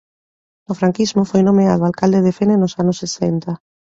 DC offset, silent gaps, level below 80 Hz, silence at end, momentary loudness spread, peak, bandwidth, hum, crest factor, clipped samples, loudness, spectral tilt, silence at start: under 0.1%; none; -52 dBFS; 0.4 s; 10 LU; -2 dBFS; 7.8 kHz; none; 14 dB; under 0.1%; -16 LUFS; -7 dB/octave; 0.7 s